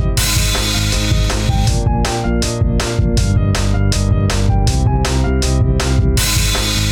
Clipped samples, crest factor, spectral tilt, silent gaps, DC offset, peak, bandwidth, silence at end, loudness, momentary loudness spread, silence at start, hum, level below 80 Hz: under 0.1%; 8 dB; -4.5 dB/octave; none; under 0.1%; -4 dBFS; over 20 kHz; 0 s; -15 LUFS; 2 LU; 0 s; none; -18 dBFS